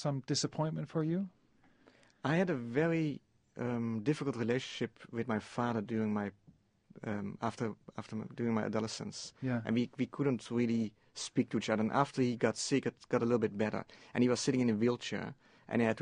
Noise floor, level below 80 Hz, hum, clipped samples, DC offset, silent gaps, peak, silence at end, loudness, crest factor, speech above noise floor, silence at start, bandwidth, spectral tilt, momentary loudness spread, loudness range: -66 dBFS; -72 dBFS; none; under 0.1%; under 0.1%; none; -14 dBFS; 0 s; -35 LUFS; 22 dB; 32 dB; 0 s; 10 kHz; -5.5 dB/octave; 10 LU; 5 LU